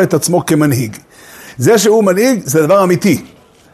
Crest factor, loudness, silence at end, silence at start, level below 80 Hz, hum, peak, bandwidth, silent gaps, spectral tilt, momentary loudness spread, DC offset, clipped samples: 12 dB; -11 LUFS; 0.45 s; 0 s; -52 dBFS; none; 0 dBFS; 13.5 kHz; none; -5 dB/octave; 9 LU; under 0.1%; under 0.1%